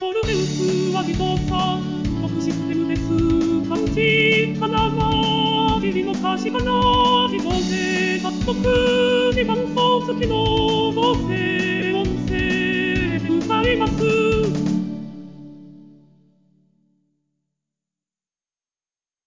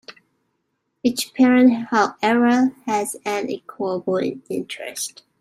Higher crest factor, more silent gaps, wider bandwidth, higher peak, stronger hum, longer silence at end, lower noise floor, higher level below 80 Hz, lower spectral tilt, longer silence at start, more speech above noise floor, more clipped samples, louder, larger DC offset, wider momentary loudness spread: about the same, 14 dB vs 18 dB; neither; second, 7.6 kHz vs 15.5 kHz; about the same, -6 dBFS vs -4 dBFS; neither; first, 3.45 s vs 0.3 s; first, under -90 dBFS vs -73 dBFS; first, -36 dBFS vs -68 dBFS; first, -5.5 dB/octave vs -4 dB/octave; about the same, 0 s vs 0.1 s; first, over 71 dB vs 54 dB; neither; about the same, -19 LUFS vs -20 LUFS; first, 0.1% vs under 0.1%; second, 6 LU vs 13 LU